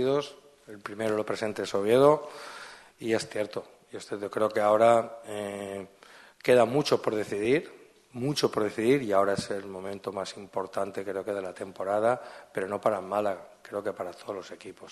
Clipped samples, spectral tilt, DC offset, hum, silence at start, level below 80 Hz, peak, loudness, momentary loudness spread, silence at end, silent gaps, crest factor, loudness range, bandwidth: under 0.1%; -5 dB/octave; under 0.1%; none; 0 s; -70 dBFS; -8 dBFS; -28 LUFS; 19 LU; 0 s; none; 20 dB; 5 LU; 12.5 kHz